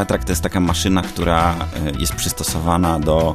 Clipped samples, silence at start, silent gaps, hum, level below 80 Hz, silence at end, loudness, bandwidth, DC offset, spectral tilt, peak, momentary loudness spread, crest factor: under 0.1%; 0 s; none; none; -28 dBFS; 0 s; -18 LUFS; 14 kHz; under 0.1%; -5 dB/octave; 0 dBFS; 4 LU; 18 dB